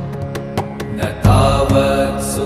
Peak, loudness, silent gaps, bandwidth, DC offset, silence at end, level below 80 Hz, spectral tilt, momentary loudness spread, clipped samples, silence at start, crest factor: 0 dBFS; -16 LUFS; none; 15.5 kHz; under 0.1%; 0 s; -26 dBFS; -6 dB/octave; 12 LU; under 0.1%; 0 s; 16 dB